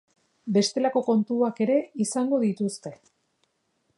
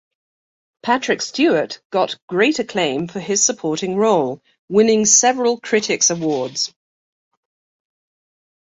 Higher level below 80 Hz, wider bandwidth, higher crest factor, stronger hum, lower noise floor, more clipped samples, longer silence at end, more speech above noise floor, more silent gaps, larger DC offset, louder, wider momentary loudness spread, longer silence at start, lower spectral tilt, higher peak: second, -78 dBFS vs -64 dBFS; first, 11.5 kHz vs 8 kHz; about the same, 16 dB vs 18 dB; neither; second, -73 dBFS vs under -90 dBFS; neither; second, 1.05 s vs 2 s; second, 48 dB vs over 72 dB; second, none vs 1.85-1.90 s, 2.22-2.28 s, 4.59-4.68 s; neither; second, -25 LUFS vs -17 LUFS; about the same, 10 LU vs 10 LU; second, 0.45 s vs 0.85 s; first, -5.5 dB/octave vs -2.5 dB/octave; second, -10 dBFS vs -2 dBFS